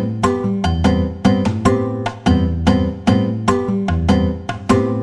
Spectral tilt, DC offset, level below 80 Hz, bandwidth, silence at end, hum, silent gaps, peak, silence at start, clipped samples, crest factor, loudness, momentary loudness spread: -7 dB/octave; under 0.1%; -30 dBFS; 11 kHz; 0 s; none; none; -2 dBFS; 0 s; under 0.1%; 14 dB; -17 LUFS; 3 LU